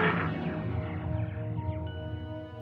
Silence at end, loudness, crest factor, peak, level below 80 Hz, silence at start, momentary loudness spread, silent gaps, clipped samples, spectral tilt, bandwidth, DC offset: 0 s; -34 LUFS; 18 dB; -14 dBFS; -48 dBFS; 0 s; 8 LU; none; under 0.1%; -9.5 dB/octave; 5 kHz; under 0.1%